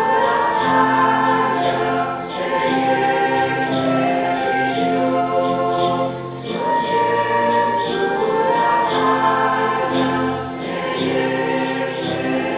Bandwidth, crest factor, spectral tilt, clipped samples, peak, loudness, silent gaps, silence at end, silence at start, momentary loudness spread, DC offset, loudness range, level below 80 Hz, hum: 4 kHz; 14 dB; -9.5 dB/octave; under 0.1%; -4 dBFS; -18 LUFS; none; 0 s; 0 s; 6 LU; under 0.1%; 2 LU; -54 dBFS; none